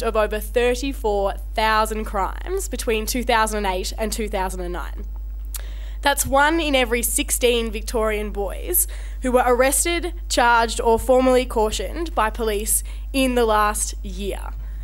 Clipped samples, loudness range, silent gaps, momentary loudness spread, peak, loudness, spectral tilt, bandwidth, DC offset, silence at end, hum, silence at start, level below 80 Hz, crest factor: under 0.1%; 5 LU; none; 12 LU; -2 dBFS; -21 LUFS; -3 dB/octave; 16.5 kHz; under 0.1%; 0 s; none; 0 s; -30 dBFS; 18 dB